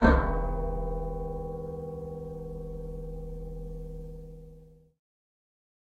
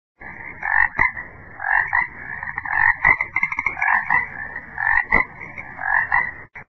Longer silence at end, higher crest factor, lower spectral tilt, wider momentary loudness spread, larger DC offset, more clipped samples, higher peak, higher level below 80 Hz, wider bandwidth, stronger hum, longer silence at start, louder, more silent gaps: first, 1.25 s vs 0.05 s; about the same, 24 dB vs 20 dB; first, -8.5 dB/octave vs -6 dB/octave; about the same, 14 LU vs 16 LU; neither; neither; second, -8 dBFS vs -2 dBFS; first, -36 dBFS vs -44 dBFS; about the same, 6.6 kHz vs 6.2 kHz; neither; second, 0 s vs 0.2 s; second, -35 LUFS vs -19 LUFS; neither